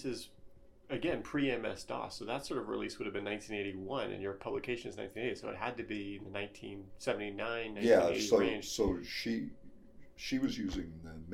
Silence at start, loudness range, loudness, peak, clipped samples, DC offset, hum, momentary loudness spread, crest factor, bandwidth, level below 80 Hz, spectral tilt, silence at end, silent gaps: 0 s; 7 LU; -36 LUFS; -14 dBFS; under 0.1%; under 0.1%; none; 13 LU; 22 dB; 16 kHz; -58 dBFS; -4.5 dB/octave; 0 s; none